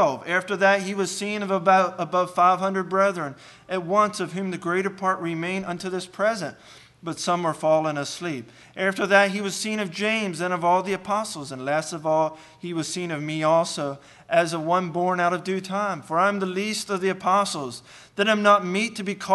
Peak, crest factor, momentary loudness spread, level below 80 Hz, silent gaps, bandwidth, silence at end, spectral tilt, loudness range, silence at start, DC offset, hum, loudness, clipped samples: -4 dBFS; 20 dB; 12 LU; -68 dBFS; none; 12.5 kHz; 0 s; -4.5 dB/octave; 4 LU; 0 s; under 0.1%; none; -24 LUFS; under 0.1%